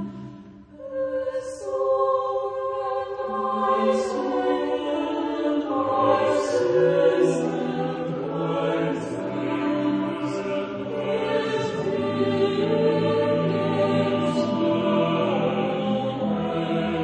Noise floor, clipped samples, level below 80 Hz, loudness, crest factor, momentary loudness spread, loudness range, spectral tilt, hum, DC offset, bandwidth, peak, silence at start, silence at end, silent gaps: -44 dBFS; under 0.1%; -60 dBFS; -24 LUFS; 16 dB; 7 LU; 4 LU; -6.5 dB/octave; none; under 0.1%; 9.8 kHz; -6 dBFS; 0 s; 0 s; none